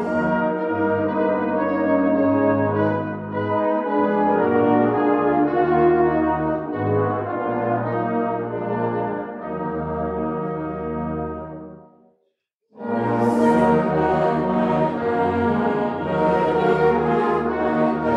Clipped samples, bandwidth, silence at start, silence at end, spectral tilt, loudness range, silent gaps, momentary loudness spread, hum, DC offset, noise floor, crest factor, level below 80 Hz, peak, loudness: under 0.1%; 10.5 kHz; 0 s; 0 s; -8.5 dB/octave; 8 LU; 12.55-12.59 s; 9 LU; none; under 0.1%; -72 dBFS; 14 dB; -48 dBFS; -6 dBFS; -21 LUFS